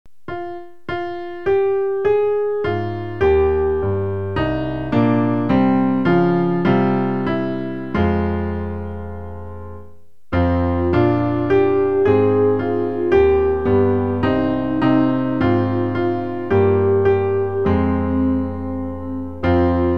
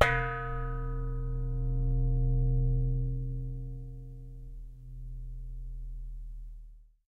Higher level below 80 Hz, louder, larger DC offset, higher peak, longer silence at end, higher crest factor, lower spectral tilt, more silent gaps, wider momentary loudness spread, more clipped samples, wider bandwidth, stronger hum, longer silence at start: about the same, -36 dBFS vs -34 dBFS; first, -18 LUFS vs -34 LUFS; first, 2% vs under 0.1%; about the same, -4 dBFS vs -6 dBFS; second, 0 s vs 0.25 s; second, 14 dB vs 26 dB; first, -10 dB/octave vs -7 dB/octave; neither; second, 12 LU vs 19 LU; neither; second, 5.6 kHz vs 7.4 kHz; neither; first, 0.3 s vs 0 s